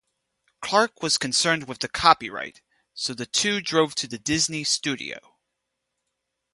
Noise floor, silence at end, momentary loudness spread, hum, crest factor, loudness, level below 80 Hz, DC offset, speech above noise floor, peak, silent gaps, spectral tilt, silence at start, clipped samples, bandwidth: -80 dBFS; 1.35 s; 15 LU; none; 26 dB; -23 LUFS; -58 dBFS; under 0.1%; 56 dB; 0 dBFS; none; -2 dB/octave; 0.6 s; under 0.1%; 11.5 kHz